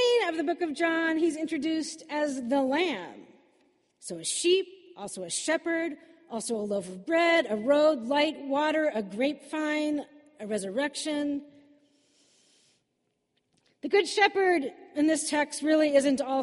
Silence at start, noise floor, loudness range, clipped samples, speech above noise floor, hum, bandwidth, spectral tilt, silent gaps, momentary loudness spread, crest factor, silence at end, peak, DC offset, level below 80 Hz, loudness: 0 s; -78 dBFS; 7 LU; under 0.1%; 50 dB; none; 11.5 kHz; -3 dB/octave; none; 14 LU; 18 dB; 0 s; -10 dBFS; under 0.1%; -76 dBFS; -27 LUFS